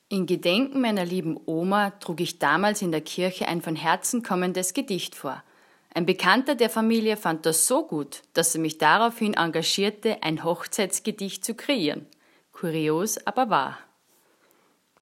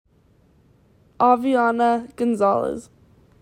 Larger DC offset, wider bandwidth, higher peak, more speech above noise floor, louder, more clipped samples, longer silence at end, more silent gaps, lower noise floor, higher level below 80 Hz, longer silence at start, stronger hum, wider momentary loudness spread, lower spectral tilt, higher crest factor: neither; first, 16.5 kHz vs 13 kHz; about the same, -4 dBFS vs -4 dBFS; about the same, 39 dB vs 38 dB; second, -25 LUFS vs -20 LUFS; neither; first, 1.2 s vs 0.6 s; neither; first, -64 dBFS vs -58 dBFS; second, -78 dBFS vs -60 dBFS; second, 0.1 s vs 1.2 s; neither; first, 10 LU vs 7 LU; second, -3.5 dB/octave vs -6 dB/octave; about the same, 22 dB vs 18 dB